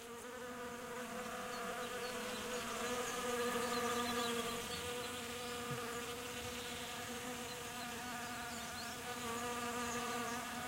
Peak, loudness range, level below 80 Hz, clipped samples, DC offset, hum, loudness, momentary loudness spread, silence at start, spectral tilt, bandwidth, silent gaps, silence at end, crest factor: -26 dBFS; 4 LU; -66 dBFS; under 0.1%; under 0.1%; none; -42 LUFS; 7 LU; 0 s; -2.5 dB/octave; 16 kHz; none; 0 s; 18 dB